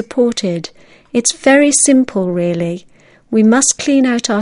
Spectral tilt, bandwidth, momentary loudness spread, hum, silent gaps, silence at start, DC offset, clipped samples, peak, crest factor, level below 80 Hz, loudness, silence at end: -3.5 dB/octave; 11 kHz; 12 LU; none; none; 0 s; under 0.1%; under 0.1%; 0 dBFS; 14 dB; -54 dBFS; -13 LUFS; 0 s